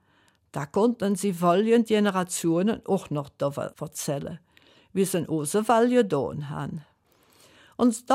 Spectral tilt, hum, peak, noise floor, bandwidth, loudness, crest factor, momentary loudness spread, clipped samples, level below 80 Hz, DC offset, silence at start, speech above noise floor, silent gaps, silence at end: -5.5 dB/octave; none; -8 dBFS; -64 dBFS; 16 kHz; -25 LUFS; 16 dB; 14 LU; under 0.1%; -64 dBFS; under 0.1%; 0.55 s; 40 dB; none; 0 s